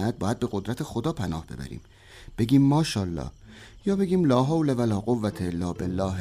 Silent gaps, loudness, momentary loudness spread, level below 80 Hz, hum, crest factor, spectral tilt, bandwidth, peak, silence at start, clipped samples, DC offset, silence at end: none; -26 LUFS; 16 LU; -48 dBFS; none; 16 dB; -7 dB/octave; 15 kHz; -8 dBFS; 0 s; under 0.1%; under 0.1%; 0 s